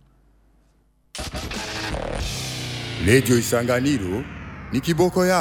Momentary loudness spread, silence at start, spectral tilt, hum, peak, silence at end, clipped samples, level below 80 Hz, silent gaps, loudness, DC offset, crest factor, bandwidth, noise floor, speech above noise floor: 13 LU; 1.15 s; -5 dB/octave; none; -4 dBFS; 0 s; under 0.1%; -40 dBFS; none; -22 LUFS; under 0.1%; 20 dB; 18 kHz; -61 dBFS; 41 dB